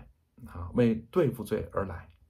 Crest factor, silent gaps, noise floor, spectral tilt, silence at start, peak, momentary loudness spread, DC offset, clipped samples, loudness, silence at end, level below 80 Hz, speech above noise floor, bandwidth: 18 dB; none; -51 dBFS; -8 dB/octave; 0 s; -14 dBFS; 13 LU; under 0.1%; under 0.1%; -30 LUFS; 0.25 s; -52 dBFS; 23 dB; 15.5 kHz